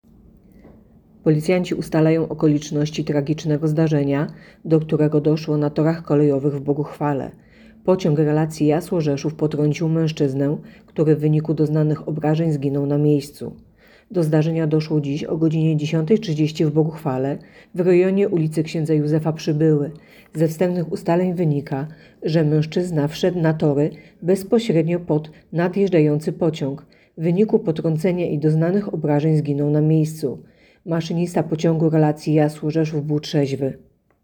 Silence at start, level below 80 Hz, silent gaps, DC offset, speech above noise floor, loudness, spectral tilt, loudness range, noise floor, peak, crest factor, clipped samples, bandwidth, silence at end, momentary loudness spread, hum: 1.25 s; -56 dBFS; none; under 0.1%; 30 dB; -20 LUFS; -8 dB/octave; 1 LU; -50 dBFS; -4 dBFS; 16 dB; under 0.1%; 18.5 kHz; 0.45 s; 8 LU; none